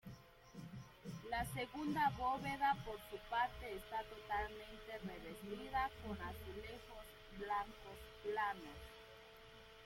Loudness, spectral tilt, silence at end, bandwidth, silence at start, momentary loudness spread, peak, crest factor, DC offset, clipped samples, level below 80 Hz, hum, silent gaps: -44 LUFS; -5 dB/octave; 0 s; 16.5 kHz; 0.05 s; 18 LU; -26 dBFS; 18 dB; under 0.1%; under 0.1%; -62 dBFS; none; none